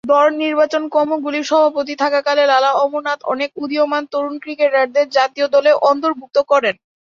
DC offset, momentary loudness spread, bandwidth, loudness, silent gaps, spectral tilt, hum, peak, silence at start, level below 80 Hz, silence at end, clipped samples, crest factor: under 0.1%; 8 LU; 7.4 kHz; -16 LUFS; none; -3 dB/octave; none; -2 dBFS; 0.05 s; -68 dBFS; 0.4 s; under 0.1%; 14 dB